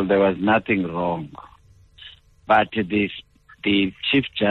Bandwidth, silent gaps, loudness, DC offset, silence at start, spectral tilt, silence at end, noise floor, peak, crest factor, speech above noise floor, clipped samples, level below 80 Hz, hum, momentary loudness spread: 4.4 kHz; none; -21 LUFS; under 0.1%; 0 s; -8 dB/octave; 0 s; -51 dBFS; -6 dBFS; 16 dB; 31 dB; under 0.1%; -52 dBFS; none; 9 LU